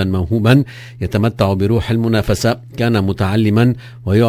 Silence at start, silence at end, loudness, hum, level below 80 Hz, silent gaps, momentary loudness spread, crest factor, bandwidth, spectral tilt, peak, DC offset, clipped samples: 0 s; 0 s; -16 LUFS; none; -32 dBFS; none; 6 LU; 14 dB; 16 kHz; -7 dB/octave; 0 dBFS; under 0.1%; under 0.1%